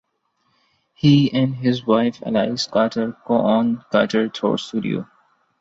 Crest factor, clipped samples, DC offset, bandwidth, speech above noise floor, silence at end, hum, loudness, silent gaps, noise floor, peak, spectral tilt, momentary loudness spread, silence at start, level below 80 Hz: 18 dB; under 0.1%; under 0.1%; 8 kHz; 50 dB; 0.55 s; none; -20 LUFS; none; -68 dBFS; -2 dBFS; -6.5 dB/octave; 8 LU; 1.05 s; -60 dBFS